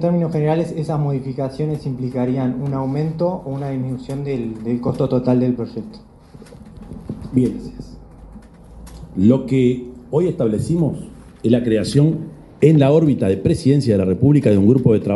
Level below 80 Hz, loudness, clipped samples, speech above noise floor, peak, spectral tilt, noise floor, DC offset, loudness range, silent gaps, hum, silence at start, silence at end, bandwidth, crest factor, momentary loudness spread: -44 dBFS; -18 LUFS; under 0.1%; 24 dB; 0 dBFS; -8.5 dB/octave; -41 dBFS; under 0.1%; 7 LU; none; none; 0 s; 0 s; 11.5 kHz; 18 dB; 17 LU